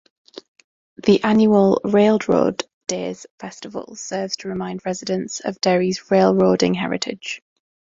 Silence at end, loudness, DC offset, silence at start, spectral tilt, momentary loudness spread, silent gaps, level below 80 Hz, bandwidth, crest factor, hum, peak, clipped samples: 0.55 s; -19 LUFS; under 0.1%; 1.05 s; -5.5 dB/octave; 16 LU; 2.73-2.81 s, 3.31-3.38 s; -58 dBFS; 7.8 kHz; 18 dB; none; -2 dBFS; under 0.1%